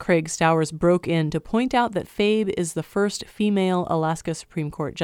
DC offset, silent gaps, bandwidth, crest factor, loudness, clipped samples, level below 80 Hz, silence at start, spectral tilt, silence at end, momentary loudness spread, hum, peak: under 0.1%; none; 16 kHz; 16 dB; -23 LUFS; under 0.1%; -50 dBFS; 0 s; -5.5 dB/octave; 0 s; 8 LU; none; -6 dBFS